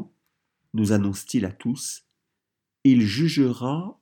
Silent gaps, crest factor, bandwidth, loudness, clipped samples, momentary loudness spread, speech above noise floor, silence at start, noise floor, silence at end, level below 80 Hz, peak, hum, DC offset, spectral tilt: none; 18 dB; 18 kHz; -23 LUFS; under 0.1%; 14 LU; 61 dB; 0 s; -84 dBFS; 0.1 s; -68 dBFS; -6 dBFS; none; under 0.1%; -6 dB/octave